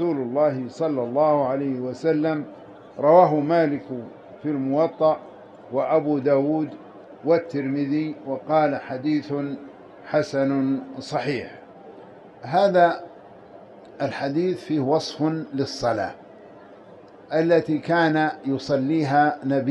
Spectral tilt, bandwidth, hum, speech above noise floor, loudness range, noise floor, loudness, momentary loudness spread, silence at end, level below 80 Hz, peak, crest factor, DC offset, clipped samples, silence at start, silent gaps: -7 dB/octave; 9.2 kHz; none; 24 dB; 5 LU; -46 dBFS; -23 LUFS; 13 LU; 0 s; -66 dBFS; -4 dBFS; 20 dB; under 0.1%; under 0.1%; 0 s; none